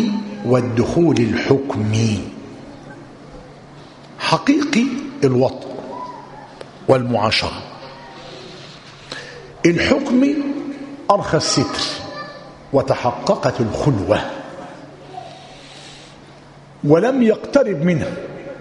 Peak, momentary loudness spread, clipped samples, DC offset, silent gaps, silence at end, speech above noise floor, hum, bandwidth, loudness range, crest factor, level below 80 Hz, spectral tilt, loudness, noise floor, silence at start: 0 dBFS; 22 LU; under 0.1%; under 0.1%; none; 0 s; 26 dB; none; 11 kHz; 4 LU; 20 dB; -48 dBFS; -5.5 dB/octave; -18 LUFS; -42 dBFS; 0 s